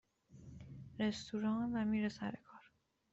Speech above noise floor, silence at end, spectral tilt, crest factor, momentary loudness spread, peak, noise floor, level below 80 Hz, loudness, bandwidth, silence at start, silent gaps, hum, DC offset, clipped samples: 35 dB; 0.5 s; -6 dB/octave; 14 dB; 19 LU; -26 dBFS; -73 dBFS; -68 dBFS; -39 LUFS; 8 kHz; 0.3 s; none; none; under 0.1%; under 0.1%